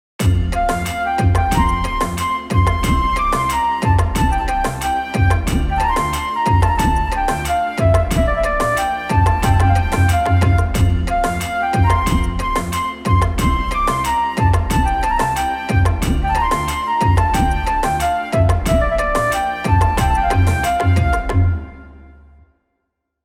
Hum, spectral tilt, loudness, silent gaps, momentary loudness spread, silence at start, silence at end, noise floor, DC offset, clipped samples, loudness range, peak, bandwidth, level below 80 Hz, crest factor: none; -6 dB/octave; -17 LUFS; none; 4 LU; 0.2 s; 1.15 s; -74 dBFS; under 0.1%; under 0.1%; 2 LU; -2 dBFS; 16 kHz; -24 dBFS; 14 dB